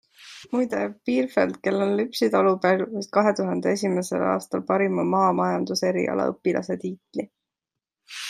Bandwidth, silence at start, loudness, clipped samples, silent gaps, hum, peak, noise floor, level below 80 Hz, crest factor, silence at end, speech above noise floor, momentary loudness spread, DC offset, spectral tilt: 15.5 kHz; 0.2 s; -24 LUFS; under 0.1%; none; none; -4 dBFS; -87 dBFS; -72 dBFS; 20 dB; 0 s; 64 dB; 11 LU; under 0.1%; -5.5 dB/octave